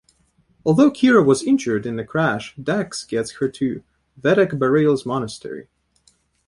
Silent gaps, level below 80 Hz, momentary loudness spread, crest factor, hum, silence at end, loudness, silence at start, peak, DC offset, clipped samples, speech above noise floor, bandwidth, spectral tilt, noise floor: none; -56 dBFS; 12 LU; 18 dB; none; 0.85 s; -19 LUFS; 0.65 s; -2 dBFS; under 0.1%; under 0.1%; 42 dB; 11.5 kHz; -6 dB/octave; -61 dBFS